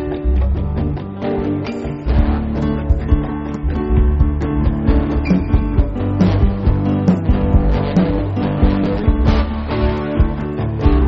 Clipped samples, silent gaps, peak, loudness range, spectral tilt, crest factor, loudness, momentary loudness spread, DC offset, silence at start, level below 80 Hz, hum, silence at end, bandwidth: under 0.1%; none; 0 dBFS; 3 LU; -8 dB/octave; 14 dB; -17 LUFS; 6 LU; under 0.1%; 0 s; -18 dBFS; none; 0 s; 6 kHz